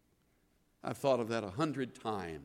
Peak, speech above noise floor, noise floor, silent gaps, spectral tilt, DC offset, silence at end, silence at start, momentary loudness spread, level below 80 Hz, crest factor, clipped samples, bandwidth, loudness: -18 dBFS; 37 dB; -73 dBFS; none; -6 dB/octave; under 0.1%; 0 s; 0.85 s; 9 LU; -70 dBFS; 20 dB; under 0.1%; 16.5 kHz; -36 LUFS